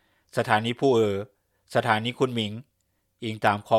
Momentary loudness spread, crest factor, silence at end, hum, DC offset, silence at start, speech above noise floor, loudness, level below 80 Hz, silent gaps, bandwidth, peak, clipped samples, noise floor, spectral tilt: 13 LU; 22 dB; 0 s; none; under 0.1%; 0.35 s; 49 dB; -25 LUFS; -70 dBFS; none; 15 kHz; -4 dBFS; under 0.1%; -73 dBFS; -5.5 dB/octave